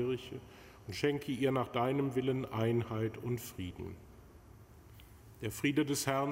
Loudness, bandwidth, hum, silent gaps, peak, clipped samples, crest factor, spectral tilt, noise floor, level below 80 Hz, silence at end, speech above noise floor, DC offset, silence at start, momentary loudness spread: -35 LUFS; 16 kHz; none; none; -16 dBFS; under 0.1%; 20 dB; -5.5 dB/octave; -57 dBFS; -62 dBFS; 0 s; 22 dB; under 0.1%; 0 s; 15 LU